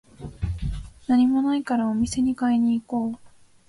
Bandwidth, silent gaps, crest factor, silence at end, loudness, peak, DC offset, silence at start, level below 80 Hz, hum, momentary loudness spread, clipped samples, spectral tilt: 11.5 kHz; none; 14 dB; 0.4 s; -24 LUFS; -10 dBFS; under 0.1%; 0.2 s; -40 dBFS; none; 13 LU; under 0.1%; -6.5 dB/octave